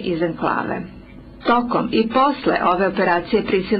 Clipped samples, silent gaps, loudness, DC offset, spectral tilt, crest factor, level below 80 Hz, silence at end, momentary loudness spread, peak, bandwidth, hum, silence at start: under 0.1%; none; -19 LUFS; under 0.1%; -9.5 dB/octave; 14 dB; -46 dBFS; 0 s; 8 LU; -6 dBFS; 5.6 kHz; none; 0 s